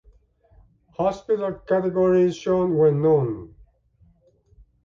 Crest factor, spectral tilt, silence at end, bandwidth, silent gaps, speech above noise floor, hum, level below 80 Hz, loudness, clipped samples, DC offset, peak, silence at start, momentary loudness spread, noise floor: 14 dB; -8.5 dB/octave; 1.4 s; 7.4 kHz; none; 39 dB; none; -54 dBFS; -21 LUFS; under 0.1%; under 0.1%; -8 dBFS; 1 s; 8 LU; -59 dBFS